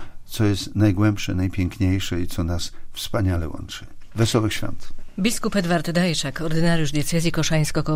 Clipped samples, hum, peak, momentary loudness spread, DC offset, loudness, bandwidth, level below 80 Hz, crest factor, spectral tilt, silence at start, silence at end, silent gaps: under 0.1%; none; -6 dBFS; 12 LU; under 0.1%; -23 LUFS; 16 kHz; -36 dBFS; 16 dB; -5.5 dB/octave; 0 s; 0 s; none